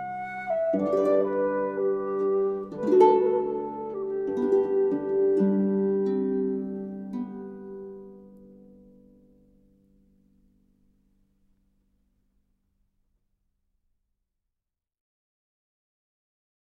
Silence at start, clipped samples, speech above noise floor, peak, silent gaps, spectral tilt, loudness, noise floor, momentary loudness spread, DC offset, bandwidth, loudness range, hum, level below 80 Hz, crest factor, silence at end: 0 s; under 0.1%; 66 dB; -6 dBFS; none; -9.5 dB/octave; -26 LUFS; -87 dBFS; 13 LU; under 0.1%; 6 kHz; 16 LU; none; -66 dBFS; 22 dB; 8.2 s